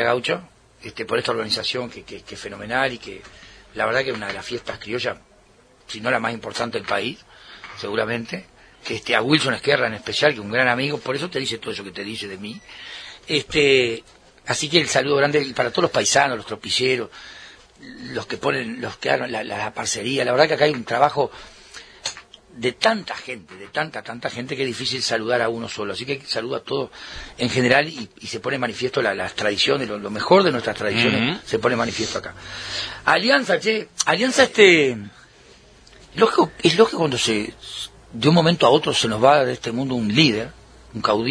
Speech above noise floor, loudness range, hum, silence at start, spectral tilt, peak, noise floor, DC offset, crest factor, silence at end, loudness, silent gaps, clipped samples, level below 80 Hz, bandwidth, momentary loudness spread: 32 dB; 8 LU; none; 0 s; -3.5 dB/octave; 0 dBFS; -53 dBFS; under 0.1%; 22 dB; 0 s; -20 LUFS; none; under 0.1%; -54 dBFS; 11 kHz; 18 LU